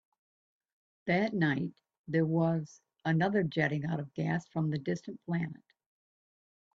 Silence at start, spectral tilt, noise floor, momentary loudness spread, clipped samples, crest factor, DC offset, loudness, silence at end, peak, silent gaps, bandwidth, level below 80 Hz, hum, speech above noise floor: 1.05 s; -8 dB/octave; under -90 dBFS; 10 LU; under 0.1%; 18 dB; under 0.1%; -32 LUFS; 1.2 s; -16 dBFS; 1.98-2.04 s; 7.2 kHz; -70 dBFS; none; over 59 dB